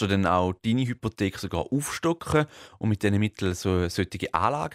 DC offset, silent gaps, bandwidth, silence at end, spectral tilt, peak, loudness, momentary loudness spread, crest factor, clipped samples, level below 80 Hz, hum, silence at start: under 0.1%; none; 16 kHz; 0 s; -6 dB/octave; -6 dBFS; -27 LUFS; 5 LU; 20 dB; under 0.1%; -50 dBFS; none; 0 s